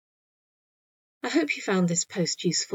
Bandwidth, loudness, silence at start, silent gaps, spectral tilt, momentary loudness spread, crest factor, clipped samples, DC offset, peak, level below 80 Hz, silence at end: 8 kHz; -26 LUFS; 1.25 s; none; -4 dB/octave; 4 LU; 18 dB; under 0.1%; under 0.1%; -12 dBFS; -84 dBFS; 0 s